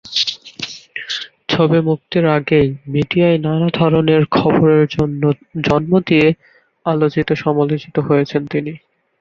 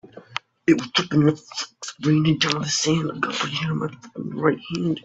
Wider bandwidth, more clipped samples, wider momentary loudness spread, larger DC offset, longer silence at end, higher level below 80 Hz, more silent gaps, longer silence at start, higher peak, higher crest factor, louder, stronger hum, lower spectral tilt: second, 7.2 kHz vs 8.2 kHz; neither; about the same, 11 LU vs 13 LU; neither; first, 0.45 s vs 0.05 s; first, -48 dBFS vs -58 dBFS; neither; about the same, 0.05 s vs 0.15 s; about the same, -2 dBFS vs -4 dBFS; second, 14 dB vs 20 dB; first, -16 LUFS vs -22 LUFS; neither; first, -7 dB/octave vs -4.5 dB/octave